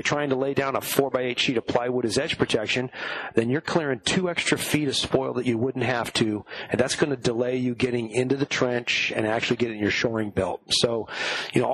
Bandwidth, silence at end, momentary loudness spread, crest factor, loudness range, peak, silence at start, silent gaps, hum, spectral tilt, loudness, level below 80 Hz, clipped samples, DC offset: 13 kHz; 0 s; 3 LU; 22 dB; 1 LU; -4 dBFS; 0 s; none; none; -4 dB/octave; -25 LUFS; -56 dBFS; under 0.1%; under 0.1%